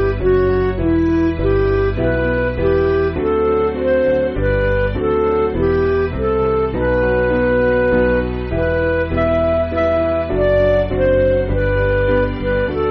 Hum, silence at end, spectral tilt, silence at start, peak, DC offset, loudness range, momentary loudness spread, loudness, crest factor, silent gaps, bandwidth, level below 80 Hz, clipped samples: none; 0 s; -6.5 dB/octave; 0 s; -4 dBFS; under 0.1%; 1 LU; 3 LU; -16 LUFS; 12 dB; none; 5.8 kHz; -26 dBFS; under 0.1%